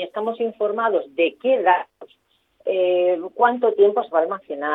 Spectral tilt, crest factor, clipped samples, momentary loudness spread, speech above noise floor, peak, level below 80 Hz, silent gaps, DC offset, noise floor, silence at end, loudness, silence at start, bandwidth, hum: -7 dB/octave; 18 dB; under 0.1%; 9 LU; 42 dB; -2 dBFS; -78 dBFS; none; under 0.1%; -62 dBFS; 0 s; -20 LUFS; 0 s; 4 kHz; none